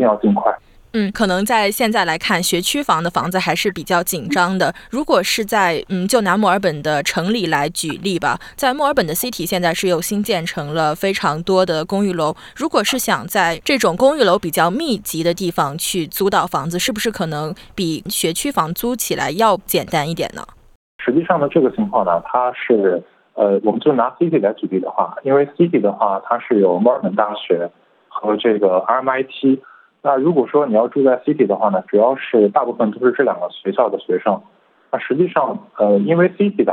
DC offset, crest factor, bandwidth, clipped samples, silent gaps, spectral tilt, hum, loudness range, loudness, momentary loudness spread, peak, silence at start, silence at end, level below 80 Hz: under 0.1%; 16 dB; 18 kHz; under 0.1%; 20.76-20.99 s; -4.5 dB/octave; none; 3 LU; -17 LUFS; 6 LU; -2 dBFS; 0 s; 0 s; -50 dBFS